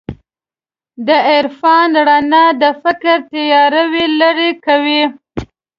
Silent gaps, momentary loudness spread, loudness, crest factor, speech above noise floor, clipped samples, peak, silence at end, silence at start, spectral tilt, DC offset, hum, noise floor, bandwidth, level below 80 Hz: none; 10 LU; -11 LUFS; 12 dB; over 79 dB; under 0.1%; 0 dBFS; 0.35 s; 0.1 s; -6 dB/octave; under 0.1%; none; under -90 dBFS; 7 kHz; -46 dBFS